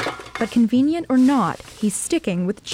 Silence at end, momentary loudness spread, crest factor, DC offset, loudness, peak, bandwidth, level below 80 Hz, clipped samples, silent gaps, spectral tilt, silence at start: 0 s; 8 LU; 14 dB; under 0.1%; -20 LUFS; -6 dBFS; 15.5 kHz; -52 dBFS; under 0.1%; none; -5 dB/octave; 0 s